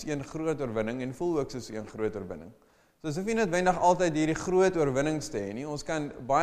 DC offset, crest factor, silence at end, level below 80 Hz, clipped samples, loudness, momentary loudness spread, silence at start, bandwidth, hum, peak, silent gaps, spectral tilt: under 0.1%; 18 dB; 0 s; -52 dBFS; under 0.1%; -29 LUFS; 12 LU; 0 s; 14.5 kHz; none; -10 dBFS; none; -5.5 dB/octave